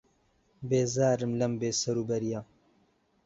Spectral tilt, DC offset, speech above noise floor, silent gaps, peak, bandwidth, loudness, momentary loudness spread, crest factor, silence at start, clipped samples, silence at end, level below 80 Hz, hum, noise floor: -5 dB/octave; under 0.1%; 40 dB; none; -14 dBFS; 8 kHz; -29 LUFS; 9 LU; 18 dB; 0.6 s; under 0.1%; 0.8 s; -64 dBFS; none; -69 dBFS